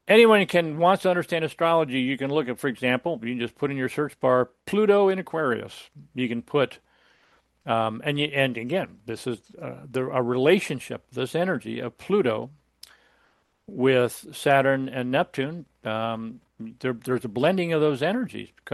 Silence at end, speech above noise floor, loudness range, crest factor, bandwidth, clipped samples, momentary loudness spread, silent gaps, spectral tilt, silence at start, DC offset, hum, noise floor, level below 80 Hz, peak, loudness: 0 s; 42 dB; 3 LU; 20 dB; 12.5 kHz; under 0.1%; 14 LU; none; -6 dB/octave; 0.05 s; under 0.1%; none; -66 dBFS; -68 dBFS; -4 dBFS; -24 LUFS